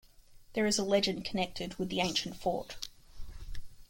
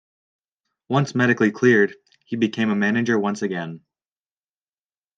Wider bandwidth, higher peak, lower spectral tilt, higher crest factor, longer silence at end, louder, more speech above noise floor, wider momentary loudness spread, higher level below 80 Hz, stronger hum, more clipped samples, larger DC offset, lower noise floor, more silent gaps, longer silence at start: first, 16.5 kHz vs 8.8 kHz; second, -14 dBFS vs -4 dBFS; second, -3.5 dB/octave vs -6.5 dB/octave; about the same, 20 dB vs 18 dB; second, 0.05 s vs 1.4 s; second, -33 LUFS vs -20 LUFS; second, 23 dB vs over 70 dB; first, 21 LU vs 11 LU; first, -50 dBFS vs -72 dBFS; neither; neither; neither; second, -56 dBFS vs under -90 dBFS; neither; second, 0.3 s vs 0.9 s